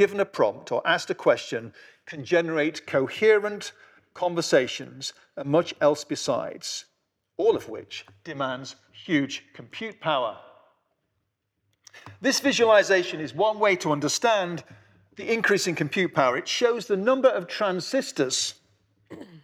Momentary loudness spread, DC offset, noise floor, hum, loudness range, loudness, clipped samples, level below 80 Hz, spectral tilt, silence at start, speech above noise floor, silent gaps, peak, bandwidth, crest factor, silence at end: 16 LU; under 0.1%; -77 dBFS; none; 8 LU; -24 LUFS; under 0.1%; -76 dBFS; -3.5 dB/octave; 0 s; 53 dB; none; -8 dBFS; 15 kHz; 18 dB; 0.05 s